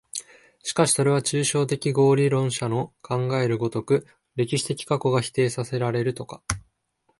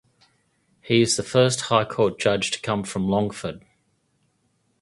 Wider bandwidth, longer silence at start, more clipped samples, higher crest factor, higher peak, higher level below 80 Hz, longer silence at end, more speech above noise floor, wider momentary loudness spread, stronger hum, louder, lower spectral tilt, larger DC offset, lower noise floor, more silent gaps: about the same, 11.5 kHz vs 11.5 kHz; second, 0.15 s vs 0.85 s; neither; about the same, 20 dB vs 20 dB; about the same, -4 dBFS vs -4 dBFS; about the same, -54 dBFS vs -56 dBFS; second, 0.6 s vs 1.25 s; about the same, 47 dB vs 47 dB; about the same, 12 LU vs 10 LU; neither; about the same, -24 LUFS vs -22 LUFS; about the same, -5 dB/octave vs -4.5 dB/octave; neither; about the same, -70 dBFS vs -68 dBFS; neither